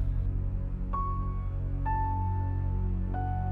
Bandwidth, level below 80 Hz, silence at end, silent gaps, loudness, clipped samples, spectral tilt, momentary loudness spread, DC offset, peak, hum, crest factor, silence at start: 2.9 kHz; -32 dBFS; 0 s; none; -33 LUFS; under 0.1%; -11 dB/octave; 4 LU; under 0.1%; -18 dBFS; none; 10 dB; 0 s